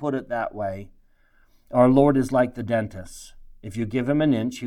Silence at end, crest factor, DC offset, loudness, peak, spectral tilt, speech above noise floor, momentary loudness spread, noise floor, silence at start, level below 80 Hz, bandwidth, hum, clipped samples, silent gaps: 0 s; 20 dB; under 0.1%; -22 LUFS; -4 dBFS; -7.5 dB/octave; 36 dB; 21 LU; -58 dBFS; 0 s; -48 dBFS; 13 kHz; none; under 0.1%; none